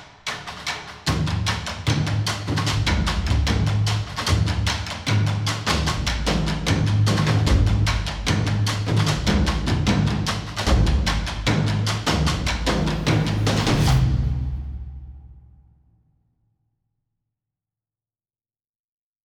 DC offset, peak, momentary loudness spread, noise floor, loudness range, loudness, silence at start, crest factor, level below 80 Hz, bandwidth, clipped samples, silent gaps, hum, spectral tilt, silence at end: under 0.1%; -6 dBFS; 7 LU; under -90 dBFS; 3 LU; -22 LUFS; 0 s; 16 dB; -28 dBFS; 14.5 kHz; under 0.1%; none; none; -5 dB/octave; 3.85 s